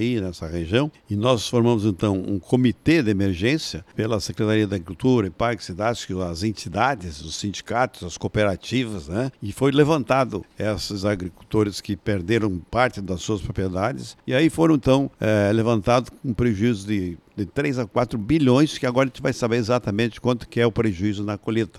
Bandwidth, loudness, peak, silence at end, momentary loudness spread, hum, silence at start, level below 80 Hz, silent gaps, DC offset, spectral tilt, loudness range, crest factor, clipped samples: 13.5 kHz; -23 LUFS; -4 dBFS; 0 s; 9 LU; none; 0 s; -46 dBFS; none; under 0.1%; -6 dB/octave; 4 LU; 18 dB; under 0.1%